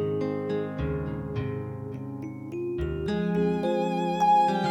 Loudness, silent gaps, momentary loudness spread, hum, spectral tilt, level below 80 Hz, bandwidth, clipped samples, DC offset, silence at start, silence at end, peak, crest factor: -28 LUFS; none; 14 LU; none; -7.5 dB/octave; -46 dBFS; 12.5 kHz; under 0.1%; under 0.1%; 0 s; 0 s; -12 dBFS; 14 dB